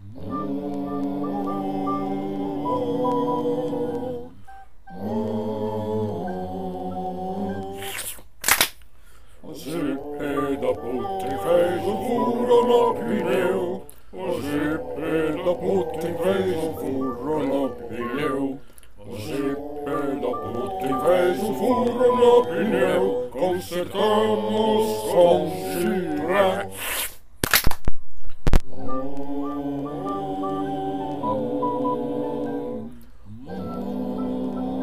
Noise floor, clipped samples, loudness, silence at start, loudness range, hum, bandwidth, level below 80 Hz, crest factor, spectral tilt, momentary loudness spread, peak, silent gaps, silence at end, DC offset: -50 dBFS; under 0.1%; -24 LUFS; 0 s; 8 LU; none; 15.5 kHz; -36 dBFS; 18 dB; -5 dB/octave; 11 LU; -4 dBFS; none; 0 s; 1%